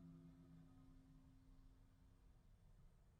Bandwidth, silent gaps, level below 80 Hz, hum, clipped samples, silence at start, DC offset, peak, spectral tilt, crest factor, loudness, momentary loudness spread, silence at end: 8.8 kHz; none; -70 dBFS; none; under 0.1%; 0 s; under 0.1%; -54 dBFS; -7.5 dB/octave; 14 dB; -67 LUFS; 5 LU; 0 s